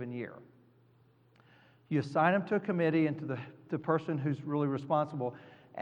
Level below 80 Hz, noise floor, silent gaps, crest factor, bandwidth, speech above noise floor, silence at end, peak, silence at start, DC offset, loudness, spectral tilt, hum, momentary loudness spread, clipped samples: -84 dBFS; -65 dBFS; none; 22 dB; 9 kHz; 33 dB; 0 s; -12 dBFS; 0 s; under 0.1%; -33 LUFS; -8.5 dB/octave; none; 13 LU; under 0.1%